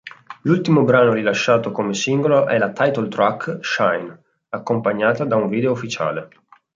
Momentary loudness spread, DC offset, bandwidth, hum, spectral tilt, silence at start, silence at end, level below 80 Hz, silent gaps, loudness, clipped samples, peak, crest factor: 11 LU; under 0.1%; 7.6 kHz; none; -6 dB/octave; 0.05 s; 0.5 s; -62 dBFS; none; -18 LUFS; under 0.1%; -2 dBFS; 16 dB